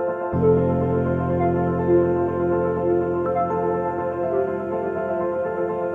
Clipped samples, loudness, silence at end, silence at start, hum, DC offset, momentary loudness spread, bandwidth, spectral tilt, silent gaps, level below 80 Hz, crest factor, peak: under 0.1%; -22 LUFS; 0 s; 0 s; none; under 0.1%; 6 LU; 3.6 kHz; -11 dB/octave; none; -46 dBFS; 14 dB; -8 dBFS